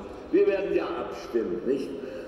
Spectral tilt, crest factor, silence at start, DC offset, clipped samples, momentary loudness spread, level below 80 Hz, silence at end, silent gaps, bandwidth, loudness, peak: -6.5 dB/octave; 14 dB; 0 s; under 0.1%; under 0.1%; 9 LU; -56 dBFS; 0 s; none; 11.5 kHz; -28 LUFS; -12 dBFS